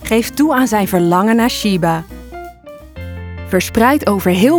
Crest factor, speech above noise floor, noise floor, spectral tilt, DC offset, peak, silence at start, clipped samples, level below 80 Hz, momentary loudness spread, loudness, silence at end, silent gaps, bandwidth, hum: 14 dB; 23 dB; -35 dBFS; -5.5 dB/octave; under 0.1%; 0 dBFS; 0 s; under 0.1%; -38 dBFS; 19 LU; -14 LUFS; 0 s; none; over 20 kHz; none